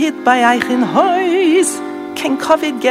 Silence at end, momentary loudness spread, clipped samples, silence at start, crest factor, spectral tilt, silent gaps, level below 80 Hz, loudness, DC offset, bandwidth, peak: 0 s; 8 LU; under 0.1%; 0 s; 14 dB; -3.5 dB/octave; none; -58 dBFS; -14 LUFS; under 0.1%; 16 kHz; 0 dBFS